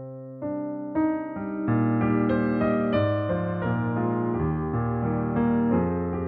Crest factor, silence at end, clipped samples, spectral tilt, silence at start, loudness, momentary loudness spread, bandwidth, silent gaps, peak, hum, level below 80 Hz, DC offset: 14 dB; 0 s; under 0.1%; -12 dB/octave; 0 s; -26 LUFS; 8 LU; 4.6 kHz; none; -10 dBFS; none; -46 dBFS; under 0.1%